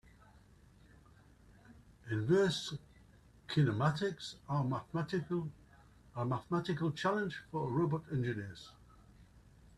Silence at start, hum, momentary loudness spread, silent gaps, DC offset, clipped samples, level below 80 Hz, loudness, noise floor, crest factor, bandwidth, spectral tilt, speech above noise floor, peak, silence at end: 0.35 s; none; 16 LU; none; under 0.1%; under 0.1%; -66 dBFS; -36 LUFS; -62 dBFS; 20 dB; 12 kHz; -6.5 dB/octave; 27 dB; -18 dBFS; 0.4 s